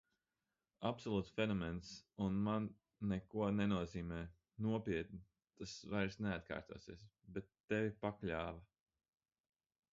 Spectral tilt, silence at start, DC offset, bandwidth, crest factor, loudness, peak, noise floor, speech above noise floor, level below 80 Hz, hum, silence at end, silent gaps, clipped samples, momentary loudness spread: -6 dB/octave; 0.8 s; under 0.1%; 7.4 kHz; 20 dB; -43 LUFS; -24 dBFS; under -90 dBFS; over 48 dB; -62 dBFS; none; 1.3 s; 7.60-7.68 s; under 0.1%; 15 LU